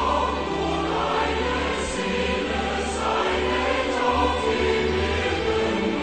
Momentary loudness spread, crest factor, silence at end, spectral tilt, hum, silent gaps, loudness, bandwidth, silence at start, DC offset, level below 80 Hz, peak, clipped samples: 3 LU; 14 dB; 0 s; -4.5 dB/octave; none; none; -23 LUFS; 9.2 kHz; 0 s; 0.3%; -36 dBFS; -10 dBFS; under 0.1%